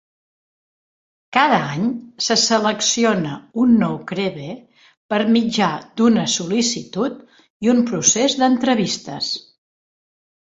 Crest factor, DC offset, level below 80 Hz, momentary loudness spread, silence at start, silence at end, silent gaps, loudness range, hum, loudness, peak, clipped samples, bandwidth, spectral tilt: 18 dB; under 0.1%; -60 dBFS; 9 LU; 1.3 s; 1.05 s; 4.97-5.09 s, 7.50-7.60 s; 2 LU; none; -18 LUFS; 0 dBFS; under 0.1%; 7.8 kHz; -3.5 dB/octave